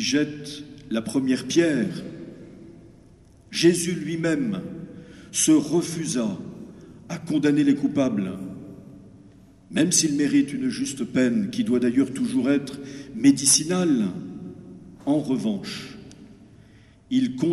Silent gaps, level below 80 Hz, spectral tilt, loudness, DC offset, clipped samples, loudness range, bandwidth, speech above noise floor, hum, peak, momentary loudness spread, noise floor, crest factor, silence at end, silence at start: none; -58 dBFS; -4 dB/octave; -23 LUFS; under 0.1%; under 0.1%; 5 LU; 13 kHz; 29 dB; none; -4 dBFS; 21 LU; -52 dBFS; 20 dB; 0 s; 0 s